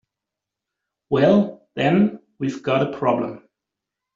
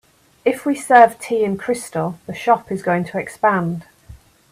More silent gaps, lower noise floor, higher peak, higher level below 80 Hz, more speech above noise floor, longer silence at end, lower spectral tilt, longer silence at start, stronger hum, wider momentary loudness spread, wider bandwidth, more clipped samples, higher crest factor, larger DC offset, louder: neither; first, -85 dBFS vs -44 dBFS; second, -4 dBFS vs 0 dBFS; second, -62 dBFS vs -54 dBFS; first, 66 dB vs 26 dB; first, 0.8 s vs 0.35 s; about the same, -6 dB/octave vs -6 dB/octave; first, 1.1 s vs 0.45 s; neither; about the same, 11 LU vs 13 LU; second, 7.4 kHz vs 15 kHz; neither; about the same, 18 dB vs 18 dB; neither; second, -21 LUFS vs -18 LUFS